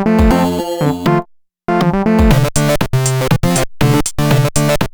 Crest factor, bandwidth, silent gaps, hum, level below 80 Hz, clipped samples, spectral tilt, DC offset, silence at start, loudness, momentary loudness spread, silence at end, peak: 12 dB; over 20 kHz; none; none; -24 dBFS; under 0.1%; -5.5 dB/octave; under 0.1%; 0 s; -14 LUFS; 5 LU; 0.05 s; 0 dBFS